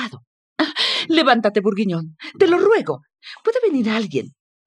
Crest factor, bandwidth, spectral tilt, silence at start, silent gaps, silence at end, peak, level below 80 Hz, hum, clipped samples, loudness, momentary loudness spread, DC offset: 18 dB; 11 kHz; -5.5 dB/octave; 0 s; 0.27-0.56 s; 0.4 s; -2 dBFS; -74 dBFS; none; under 0.1%; -18 LUFS; 15 LU; under 0.1%